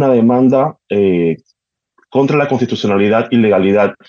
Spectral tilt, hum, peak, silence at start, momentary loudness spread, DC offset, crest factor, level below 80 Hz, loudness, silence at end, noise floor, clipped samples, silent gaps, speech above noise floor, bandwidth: -8 dB/octave; none; -2 dBFS; 0 s; 6 LU; under 0.1%; 12 dB; -58 dBFS; -13 LUFS; 0.15 s; -61 dBFS; under 0.1%; none; 49 dB; 7 kHz